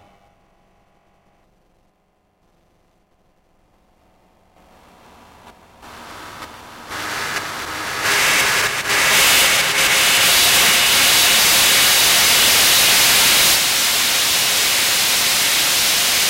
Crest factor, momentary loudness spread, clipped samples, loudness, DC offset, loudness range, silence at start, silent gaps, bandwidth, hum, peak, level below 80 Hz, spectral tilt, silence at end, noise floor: 14 dB; 14 LU; under 0.1%; -12 LUFS; under 0.1%; 16 LU; 5.45 s; none; 16 kHz; none; -4 dBFS; -48 dBFS; 1 dB/octave; 0 s; -63 dBFS